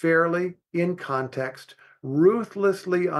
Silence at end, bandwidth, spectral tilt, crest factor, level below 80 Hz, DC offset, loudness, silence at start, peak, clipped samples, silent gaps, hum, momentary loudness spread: 0 s; 12.5 kHz; -7.5 dB/octave; 16 dB; -74 dBFS; under 0.1%; -24 LUFS; 0 s; -8 dBFS; under 0.1%; none; none; 11 LU